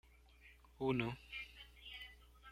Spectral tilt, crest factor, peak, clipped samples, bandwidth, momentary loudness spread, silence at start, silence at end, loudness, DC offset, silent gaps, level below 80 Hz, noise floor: -7 dB/octave; 22 dB; -24 dBFS; under 0.1%; 16 kHz; 25 LU; 0.05 s; 0 s; -44 LUFS; under 0.1%; none; -64 dBFS; -65 dBFS